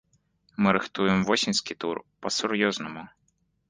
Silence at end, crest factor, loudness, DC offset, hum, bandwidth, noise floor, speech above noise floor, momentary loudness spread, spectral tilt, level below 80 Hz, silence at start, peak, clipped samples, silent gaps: 0.65 s; 24 dB; -26 LUFS; under 0.1%; none; 10 kHz; -71 dBFS; 45 dB; 12 LU; -4 dB/octave; -60 dBFS; 0.6 s; -4 dBFS; under 0.1%; none